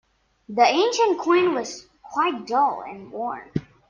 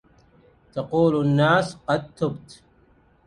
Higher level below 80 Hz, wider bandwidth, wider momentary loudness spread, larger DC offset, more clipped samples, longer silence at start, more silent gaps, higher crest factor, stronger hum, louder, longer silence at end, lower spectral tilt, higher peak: second, -62 dBFS vs -56 dBFS; second, 7.6 kHz vs 11 kHz; about the same, 15 LU vs 15 LU; neither; neither; second, 0.5 s vs 0.75 s; neither; about the same, 18 dB vs 18 dB; neither; about the same, -22 LUFS vs -22 LUFS; second, 0.3 s vs 0.75 s; second, -4 dB/octave vs -7 dB/octave; about the same, -6 dBFS vs -6 dBFS